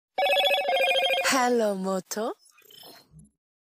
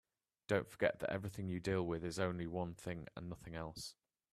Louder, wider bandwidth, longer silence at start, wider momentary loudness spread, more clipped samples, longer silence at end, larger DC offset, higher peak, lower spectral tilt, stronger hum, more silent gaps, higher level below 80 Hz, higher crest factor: first, -24 LUFS vs -42 LUFS; about the same, 15.5 kHz vs 14.5 kHz; second, 0.2 s vs 0.5 s; about the same, 10 LU vs 12 LU; neither; about the same, 0.5 s vs 0.4 s; neither; first, -12 dBFS vs -20 dBFS; second, -2.5 dB/octave vs -6 dB/octave; neither; neither; second, -72 dBFS vs -66 dBFS; second, 14 dB vs 22 dB